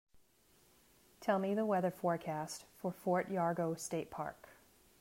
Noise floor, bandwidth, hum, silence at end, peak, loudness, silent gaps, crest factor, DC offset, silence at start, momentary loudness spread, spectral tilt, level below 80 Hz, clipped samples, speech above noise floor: -70 dBFS; 16 kHz; none; 0.5 s; -20 dBFS; -38 LUFS; none; 18 dB; under 0.1%; 0.15 s; 10 LU; -6 dB/octave; -76 dBFS; under 0.1%; 33 dB